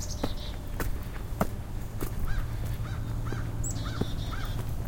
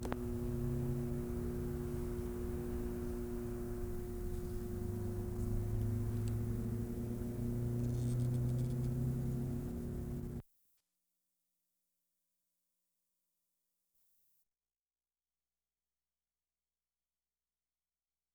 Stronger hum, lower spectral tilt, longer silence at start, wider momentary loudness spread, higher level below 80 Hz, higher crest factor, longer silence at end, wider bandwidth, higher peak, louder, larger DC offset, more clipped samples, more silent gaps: neither; second, -5.5 dB/octave vs -8.5 dB/octave; about the same, 0 s vs 0 s; about the same, 5 LU vs 6 LU; first, -34 dBFS vs -48 dBFS; about the same, 20 dB vs 24 dB; second, 0 s vs 7.9 s; second, 17 kHz vs over 20 kHz; first, -10 dBFS vs -18 dBFS; first, -35 LUFS vs -40 LUFS; neither; neither; neither